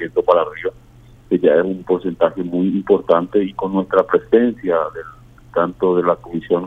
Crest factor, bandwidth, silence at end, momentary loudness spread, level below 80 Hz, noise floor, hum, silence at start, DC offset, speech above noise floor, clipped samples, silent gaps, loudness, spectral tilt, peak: 16 dB; 4.2 kHz; 0 s; 9 LU; -50 dBFS; -44 dBFS; none; 0 s; under 0.1%; 27 dB; under 0.1%; none; -18 LUFS; -9 dB/octave; 0 dBFS